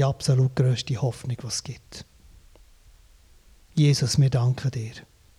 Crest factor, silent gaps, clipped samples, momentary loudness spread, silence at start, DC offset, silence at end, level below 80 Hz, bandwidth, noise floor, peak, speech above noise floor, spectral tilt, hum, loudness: 16 dB; none; under 0.1%; 19 LU; 0 s; under 0.1%; 0.35 s; -52 dBFS; 13 kHz; -54 dBFS; -8 dBFS; 31 dB; -6 dB/octave; none; -24 LUFS